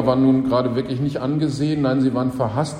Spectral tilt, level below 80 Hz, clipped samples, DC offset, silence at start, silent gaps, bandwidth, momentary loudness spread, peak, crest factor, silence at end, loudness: -7.5 dB/octave; -48 dBFS; under 0.1%; under 0.1%; 0 s; none; 10 kHz; 6 LU; -4 dBFS; 14 dB; 0 s; -20 LUFS